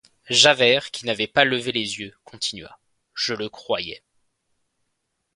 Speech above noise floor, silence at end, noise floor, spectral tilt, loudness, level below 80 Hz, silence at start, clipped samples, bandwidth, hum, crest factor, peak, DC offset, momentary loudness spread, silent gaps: 54 dB; 1.4 s; -76 dBFS; -2 dB/octave; -20 LUFS; -62 dBFS; 0.3 s; under 0.1%; 11.5 kHz; none; 24 dB; 0 dBFS; under 0.1%; 18 LU; none